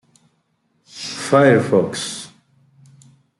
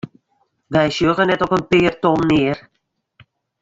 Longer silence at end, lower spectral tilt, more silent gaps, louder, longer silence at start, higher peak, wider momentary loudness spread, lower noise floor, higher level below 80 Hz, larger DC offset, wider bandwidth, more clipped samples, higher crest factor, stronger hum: about the same, 1.1 s vs 1 s; second, -5 dB/octave vs -6.5 dB/octave; neither; about the same, -17 LUFS vs -17 LUFS; first, 0.95 s vs 0.05 s; about the same, -2 dBFS vs -2 dBFS; first, 22 LU vs 7 LU; second, -66 dBFS vs -72 dBFS; second, -64 dBFS vs -48 dBFS; neither; first, 12 kHz vs 7.8 kHz; neither; about the same, 18 dB vs 16 dB; neither